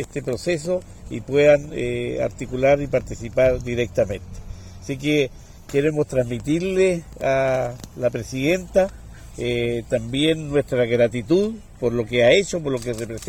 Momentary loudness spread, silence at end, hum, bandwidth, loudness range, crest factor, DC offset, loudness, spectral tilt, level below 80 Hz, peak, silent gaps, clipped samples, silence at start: 10 LU; 0 s; none; 16.5 kHz; 3 LU; 18 dB; under 0.1%; -21 LUFS; -5.5 dB/octave; -42 dBFS; -4 dBFS; none; under 0.1%; 0 s